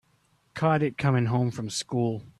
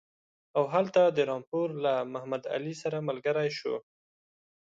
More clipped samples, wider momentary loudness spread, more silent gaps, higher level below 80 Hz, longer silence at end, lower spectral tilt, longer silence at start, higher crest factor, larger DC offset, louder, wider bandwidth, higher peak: neither; second, 6 LU vs 10 LU; second, none vs 1.47-1.52 s; first, -62 dBFS vs -78 dBFS; second, 0.1 s vs 0.9 s; about the same, -6 dB/octave vs -6 dB/octave; about the same, 0.55 s vs 0.55 s; about the same, 16 dB vs 18 dB; neither; first, -27 LUFS vs -30 LUFS; first, 12 kHz vs 7.8 kHz; about the same, -10 dBFS vs -12 dBFS